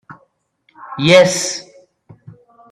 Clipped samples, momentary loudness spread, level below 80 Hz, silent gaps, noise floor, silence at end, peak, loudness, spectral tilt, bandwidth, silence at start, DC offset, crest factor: under 0.1%; 19 LU; -60 dBFS; none; -61 dBFS; 1.1 s; 0 dBFS; -13 LUFS; -3.5 dB/octave; 14 kHz; 0.1 s; under 0.1%; 18 dB